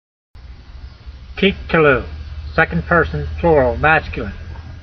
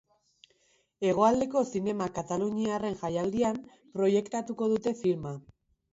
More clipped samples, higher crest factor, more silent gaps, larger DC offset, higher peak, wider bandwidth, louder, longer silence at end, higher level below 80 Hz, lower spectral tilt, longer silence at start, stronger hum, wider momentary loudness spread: neither; about the same, 18 dB vs 20 dB; neither; neither; first, 0 dBFS vs -10 dBFS; second, 6.2 kHz vs 8 kHz; first, -16 LUFS vs -29 LUFS; second, 0 s vs 0.55 s; first, -30 dBFS vs -64 dBFS; first, -8 dB/octave vs -6.5 dB/octave; second, 0.35 s vs 1 s; neither; first, 20 LU vs 10 LU